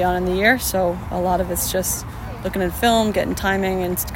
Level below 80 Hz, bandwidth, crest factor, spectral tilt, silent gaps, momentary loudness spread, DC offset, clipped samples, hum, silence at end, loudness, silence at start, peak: -34 dBFS; 16.5 kHz; 18 dB; -4 dB/octave; none; 8 LU; under 0.1%; under 0.1%; none; 0 s; -20 LUFS; 0 s; -2 dBFS